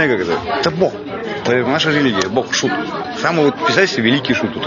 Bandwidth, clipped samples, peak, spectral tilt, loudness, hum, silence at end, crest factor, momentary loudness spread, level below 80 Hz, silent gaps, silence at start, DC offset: 7.4 kHz; under 0.1%; 0 dBFS; -4.5 dB/octave; -16 LUFS; none; 0 s; 16 dB; 7 LU; -52 dBFS; none; 0 s; under 0.1%